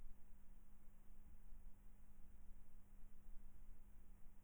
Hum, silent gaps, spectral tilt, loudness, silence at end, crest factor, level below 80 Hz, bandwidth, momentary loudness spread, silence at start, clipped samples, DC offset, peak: none; none; -6.5 dB/octave; -69 LUFS; 0 s; 12 dB; -60 dBFS; over 20 kHz; 2 LU; 0 s; under 0.1%; under 0.1%; -40 dBFS